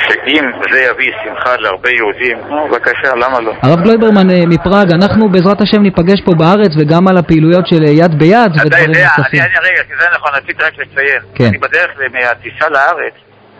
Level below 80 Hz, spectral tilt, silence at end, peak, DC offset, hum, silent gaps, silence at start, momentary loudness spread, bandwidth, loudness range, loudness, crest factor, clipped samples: -38 dBFS; -7.5 dB/octave; 0.5 s; 0 dBFS; under 0.1%; none; none; 0 s; 6 LU; 8 kHz; 4 LU; -9 LUFS; 10 dB; 1%